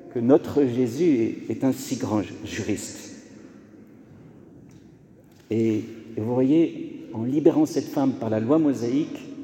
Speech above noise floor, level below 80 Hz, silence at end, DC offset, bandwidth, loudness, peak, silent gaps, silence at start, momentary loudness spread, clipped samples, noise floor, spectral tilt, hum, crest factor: 29 dB; -64 dBFS; 0 s; under 0.1%; 17 kHz; -24 LUFS; -4 dBFS; none; 0 s; 12 LU; under 0.1%; -51 dBFS; -7 dB/octave; none; 20 dB